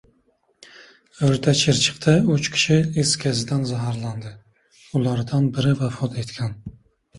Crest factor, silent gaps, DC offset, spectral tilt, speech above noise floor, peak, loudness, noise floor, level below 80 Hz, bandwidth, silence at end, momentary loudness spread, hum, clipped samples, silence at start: 18 dB; none; under 0.1%; -5 dB/octave; 44 dB; -4 dBFS; -21 LUFS; -64 dBFS; -52 dBFS; 11.5 kHz; 0 s; 12 LU; none; under 0.1%; 0.8 s